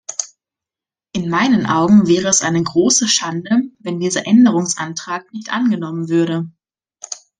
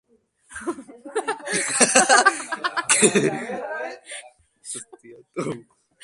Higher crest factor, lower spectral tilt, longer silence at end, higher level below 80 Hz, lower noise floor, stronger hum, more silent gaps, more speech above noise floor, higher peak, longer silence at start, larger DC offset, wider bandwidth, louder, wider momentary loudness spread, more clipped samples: second, 16 dB vs 24 dB; first, -4 dB/octave vs -1.5 dB/octave; second, 0.25 s vs 0.4 s; first, -56 dBFS vs -66 dBFS; first, -89 dBFS vs -55 dBFS; neither; neither; first, 74 dB vs 34 dB; about the same, 0 dBFS vs 0 dBFS; second, 0.1 s vs 0.5 s; neither; about the same, 10.5 kHz vs 11.5 kHz; first, -16 LUFS vs -20 LUFS; second, 14 LU vs 21 LU; neither